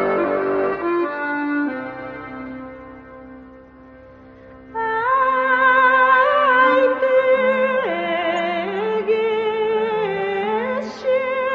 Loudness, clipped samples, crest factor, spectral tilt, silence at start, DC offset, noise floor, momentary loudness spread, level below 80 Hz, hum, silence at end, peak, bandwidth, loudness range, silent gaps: -18 LUFS; under 0.1%; 16 dB; -6 dB/octave; 0 s; under 0.1%; -43 dBFS; 18 LU; -56 dBFS; none; 0 s; -4 dBFS; 7.2 kHz; 13 LU; none